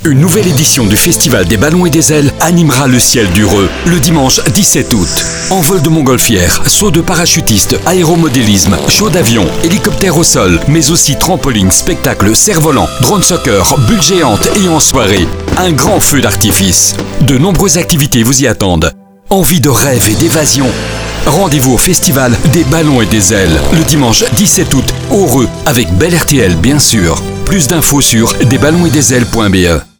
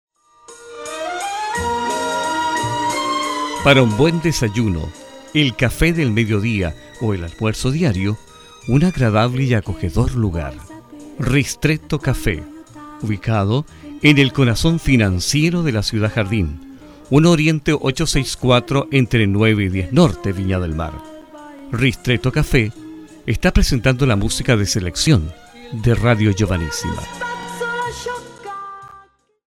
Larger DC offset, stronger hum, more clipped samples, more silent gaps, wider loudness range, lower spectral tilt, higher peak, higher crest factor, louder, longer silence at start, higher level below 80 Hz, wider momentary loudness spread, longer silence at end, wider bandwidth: neither; neither; first, 1% vs under 0.1%; neither; second, 1 LU vs 5 LU; second, -4 dB/octave vs -5.5 dB/octave; about the same, 0 dBFS vs 0 dBFS; second, 8 dB vs 18 dB; first, -7 LUFS vs -18 LUFS; second, 0 s vs 0.5 s; first, -24 dBFS vs -32 dBFS; second, 4 LU vs 16 LU; second, 0.15 s vs 0.55 s; first, over 20 kHz vs 16 kHz